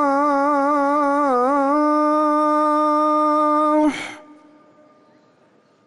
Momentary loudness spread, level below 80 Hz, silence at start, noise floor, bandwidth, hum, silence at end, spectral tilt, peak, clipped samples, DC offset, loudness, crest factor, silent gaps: 1 LU; -64 dBFS; 0 s; -56 dBFS; 11.5 kHz; none; 1.65 s; -4.5 dB/octave; -8 dBFS; under 0.1%; under 0.1%; -17 LUFS; 10 dB; none